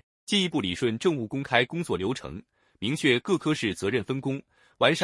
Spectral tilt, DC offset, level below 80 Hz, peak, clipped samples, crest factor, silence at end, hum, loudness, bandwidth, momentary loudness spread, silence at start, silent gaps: -5 dB/octave; under 0.1%; -62 dBFS; -4 dBFS; under 0.1%; 22 dB; 0 s; none; -27 LUFS; 12 kHz; 10 LU; 0.3 s; none